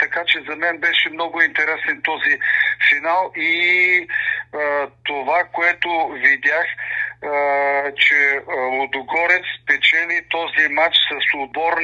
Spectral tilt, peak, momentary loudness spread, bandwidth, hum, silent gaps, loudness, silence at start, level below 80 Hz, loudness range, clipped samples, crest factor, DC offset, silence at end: -2.5 dB/octave; 0 dBFS; 8 LU; 8.2 kHz; none; none; -17 LUFS; 0 s; -64 dBFS; 2 LU; under 0.1%; 18 dB; under 0.1%; 0 s